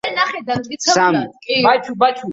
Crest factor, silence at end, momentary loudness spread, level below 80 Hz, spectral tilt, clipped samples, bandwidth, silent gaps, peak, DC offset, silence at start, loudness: 16 dB; 0 s; 7 LU; -60 dBFS; -3 dB/octave; under 0.1%; 8 kHz; none; -2 dBFS; under 0.1%; 0.05 s; -16 LUFS